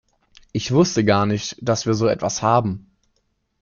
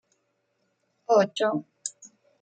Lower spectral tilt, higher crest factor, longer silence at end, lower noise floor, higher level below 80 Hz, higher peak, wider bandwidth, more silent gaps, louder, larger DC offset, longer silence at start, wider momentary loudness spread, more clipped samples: first, -5.5 dB/octave vs -4 dB/octave; about the same, 18 dB vs 20 dB; first, 0.85 s vs 0.35 s; second, -69 dBFS vs -74 dBFS; first, -52 dBFS vs -82 dBFS; first, -4 dBFS vs -8 dBFS; second, 7.4 kHz vs 9.4 kHz; neither; first, -20 LUFS vs -25 LUFS; neither; second, 0.55 s vs 1.1 s; second, 11 LU vs 15 LU; neither